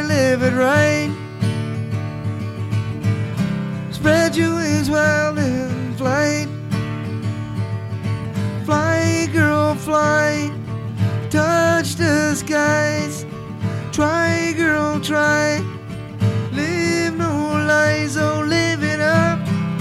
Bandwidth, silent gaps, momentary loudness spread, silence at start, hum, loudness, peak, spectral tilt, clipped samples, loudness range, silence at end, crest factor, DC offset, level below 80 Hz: 14.5 kHz; none; 10 LU; 0 s; none; -19 LUFS; -2 dBFS; -5.5 dB/octave; under 0.1%; 3 LU; 0 s; 16 dB; under 0.1%; -48 dBFS